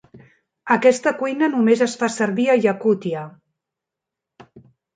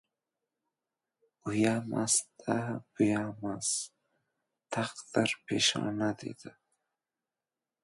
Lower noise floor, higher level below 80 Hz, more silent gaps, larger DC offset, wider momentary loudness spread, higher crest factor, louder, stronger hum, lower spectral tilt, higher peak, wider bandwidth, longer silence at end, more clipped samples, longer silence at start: second, -85 dBFS vs under -90 dBFS; about the same, -70 dBFS vs -70 dBFS; neither; neither; about the same, 12 LU vs 12 LU; about the same, 20 dB vs 22 dB; first, -19 LUFS vs -31 LUFS; neither; first, -5 dB/octave vs -3.5 dB/octave; first, -2 dBFS vs -12 dBFS; second, 9.4 kHz vs 11.5 kHz; second, 0.35 s vs 1.35 s; neither; second, 0.15 s vs 1.45 s